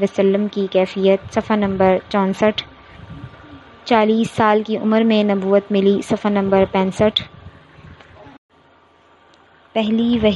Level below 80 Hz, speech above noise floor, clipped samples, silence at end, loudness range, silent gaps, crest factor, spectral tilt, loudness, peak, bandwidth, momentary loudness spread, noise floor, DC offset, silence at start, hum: -50 dBFS; 36 dB; under 0.1%; 0 s; 7 LU; 8.38-8.49 s; 16 dB; -6.5 dB/octave; -17 LUFS; -2 dBFS; 11.5 kHz; 16 LU; -52 dBFS; under 0.1%; 0 s; none